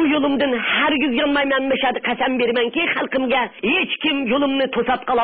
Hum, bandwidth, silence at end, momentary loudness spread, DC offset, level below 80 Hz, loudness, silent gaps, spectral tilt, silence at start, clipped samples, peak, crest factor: none; 4.6 kHz; 0 s; 3 LU; 0.2%; -52 dBFS; -19 LUFS; none; -9 dB/octave; 0 s; under 0.1%; -8 dBFS; 12 dB